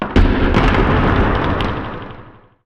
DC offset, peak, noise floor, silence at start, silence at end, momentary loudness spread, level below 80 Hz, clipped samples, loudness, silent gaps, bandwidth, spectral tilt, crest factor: under 0.1%; -4 dBFS; -40 dBFS; 0 s; 0.35 s; 14 LU; -20 dBFS; under 0.1%; -16 LUFS; none; 7 kHz; -7.5 dB/octave; 12 dB